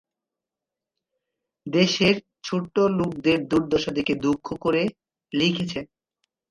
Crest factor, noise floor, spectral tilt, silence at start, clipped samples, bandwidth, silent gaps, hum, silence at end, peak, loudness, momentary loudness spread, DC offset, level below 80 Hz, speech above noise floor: 18 dB; -88 dBFS; -5.5 dB/octave; 1.65 s; under 0.1%; 11 kHz; none; none; 0.65 s; -6 dBFS; -23 LUFS; 9 LU; under 0.1%; -56 dBFS; 65 dB